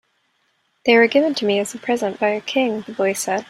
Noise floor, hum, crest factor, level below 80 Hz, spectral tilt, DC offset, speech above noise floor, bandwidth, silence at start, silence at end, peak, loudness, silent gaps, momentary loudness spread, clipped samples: -66 dBFS; none; 18 dB; -68 dBFS; -3.5 dB/octave; under 0.1%; 47 dB; 15.5 kHz; 0.85 s; 0.05 s; -2 dBFS; -19 LUFS; none; 9 LU; under 0.1%